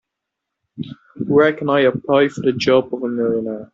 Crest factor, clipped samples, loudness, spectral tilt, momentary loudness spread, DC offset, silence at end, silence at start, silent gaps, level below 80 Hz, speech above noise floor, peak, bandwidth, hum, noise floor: 16 dB; under 0.1%; -17 LUFS; -4.5 dB/octave; 17 LU; under 0.1%; 0.1 s; 0.75 s; none; -58 dBFS; 63 dB; -2 dBFS; 7.8 kHz; none; -80 dBFS